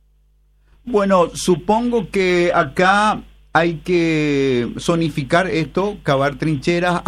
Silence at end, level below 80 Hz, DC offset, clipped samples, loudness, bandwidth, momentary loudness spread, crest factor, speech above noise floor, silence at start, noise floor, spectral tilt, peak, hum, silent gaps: 0 s; -42 dBFS; under 0.1%; under 0.1%; -17 LUFS; 13.5 kHz; 5 LU; 16 dB; 39 dB; 0.85 s; -56 dBFS; -5.5 dB/octave; -2 dBFS; 50 Hz at -40 dBFS; none